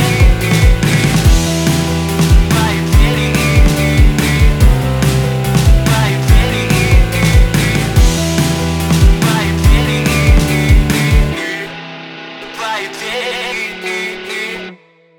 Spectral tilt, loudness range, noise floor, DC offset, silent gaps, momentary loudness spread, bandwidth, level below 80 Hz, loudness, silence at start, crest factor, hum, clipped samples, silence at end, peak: -5 dB/octave; 6 LU; -39 dBFS; under 0.1%; none; 9 LU; 18.5 kHz; -14 dBFS; -13 LUFS; 0 s; 12 dB; none; under 0.1%; 0.45 s; 0 dBFS